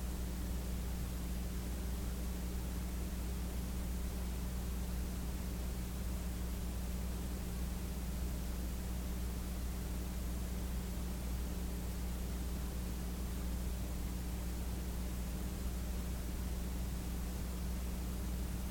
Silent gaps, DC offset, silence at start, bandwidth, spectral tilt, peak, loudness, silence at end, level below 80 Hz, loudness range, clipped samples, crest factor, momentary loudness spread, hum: none; under 0.1%; 0 s; 17.5 kHz; -5.5 dB/octave; -28 dBFS; -42 LUFS; 0 s; -40 dBFS; 0 LU; under 0.1%; 12 dB; 1 LU; none